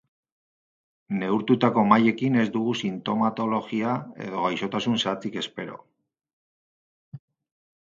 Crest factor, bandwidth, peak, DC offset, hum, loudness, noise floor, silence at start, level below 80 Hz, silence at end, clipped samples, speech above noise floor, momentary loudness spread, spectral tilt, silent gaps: 22 dB; 7.6 kHz; -4 dBFS; under 0.1%; none; -25 LUFS; under -90 dBFS; 1.1 s; -70 dBFS; 0.65 s; under 0.1%; over 66 dB; 12 LU; -6 dB/octave; 6.33-7.12 s